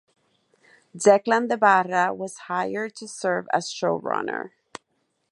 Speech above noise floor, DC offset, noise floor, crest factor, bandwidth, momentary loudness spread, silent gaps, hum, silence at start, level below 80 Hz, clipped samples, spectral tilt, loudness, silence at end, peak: 50 dB; under 0.1%; -73 dBFS; 22 dB; 11.5 kHz; 15 LU; none; none; 0.95 s; -76 dBFS; under 0.1%; -4 dB/octave; -23 LUFS; 0.85 s; -4 dBFS